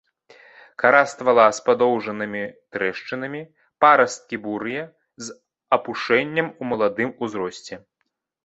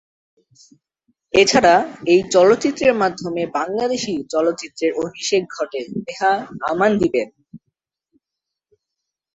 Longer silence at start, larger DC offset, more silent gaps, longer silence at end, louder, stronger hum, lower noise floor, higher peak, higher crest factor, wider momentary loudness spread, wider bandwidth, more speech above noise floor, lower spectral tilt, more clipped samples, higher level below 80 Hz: second, 0.8 s vs 1.35 s; neither; neither; second, 0.7 s vs 1.8 s; second, -21 LUFS vs -18 LUFS; neither; second, -76 dBFS vs -84 dBFS; about the same, -2 dBFS vs -2 dBFS; about the same, 20 dB vs 18 dB; first, 20 LU vs 11 LU; about the same, 8.2 kHz vs 8.2 kHz; second, 55 dB vs 66 dB; about the same, -4.5 dB/octave vs -4 dB/octave; neither; second, -66 dBFS vs -54 dBFS